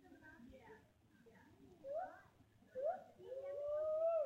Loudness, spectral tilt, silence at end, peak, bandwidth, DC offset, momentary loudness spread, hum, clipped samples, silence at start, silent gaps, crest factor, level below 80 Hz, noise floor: -45 LUFS; -6.5 dB/octave; 0 s; -32 dBFS; 7.6 kHz; under 0.1%; 25 LU; none; under 0.1%; 0.05 s; none; 14 dB; -80 dBFS; -70 dBFS